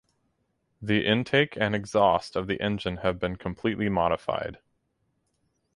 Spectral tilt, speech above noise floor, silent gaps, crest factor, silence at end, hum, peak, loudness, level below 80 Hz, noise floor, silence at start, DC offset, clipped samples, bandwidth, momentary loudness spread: -6 dB/octave; 48 dB; none; 20 dB; 1.2 s; none; -8 dBFS; -26 LUFS; -52 dBFS; -74 dBFS; 0.8 s; under 0.1%; under 0.1%; 11.5 kHz; 9 LU